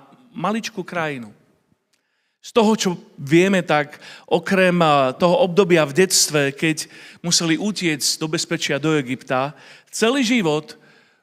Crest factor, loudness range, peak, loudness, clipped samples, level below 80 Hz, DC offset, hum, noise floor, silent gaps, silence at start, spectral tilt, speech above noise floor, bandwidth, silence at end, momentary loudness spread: 18 dB; 5 LU; -2 dBFS; -19 LUFS; under 0.1%; -66 dBFS; under 0.1%; none; -68 dBFS; none; 0.35 s; -4 dB/octave; 49 dB; 16 kHz; 0.5 s; 12 LU